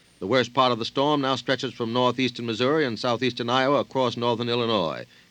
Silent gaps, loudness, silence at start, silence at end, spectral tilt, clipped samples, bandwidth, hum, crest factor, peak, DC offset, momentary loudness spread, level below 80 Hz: none; -24 LUFS; 0.2 s; 0.25 s; -5.5 dB/octave; under 0.1%; 9.6 kHz; none; 18 dB; -6 dBFS; under 0.1%; 5 LU; -68 dBFS